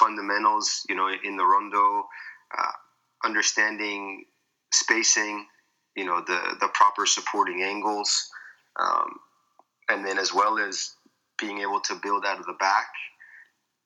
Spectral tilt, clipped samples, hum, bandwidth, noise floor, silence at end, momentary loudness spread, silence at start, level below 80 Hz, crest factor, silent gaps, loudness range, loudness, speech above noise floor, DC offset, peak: 0.5 dB/octave; under 0.1%; none; 10.5 kHz; -64 dBFS; 0.45 s; 16 LU; 0 s; under -90 dBFS; 22 dB; none; 4 LU; -25 LUFS; 39 dB; under 0.1%; -4 dBFS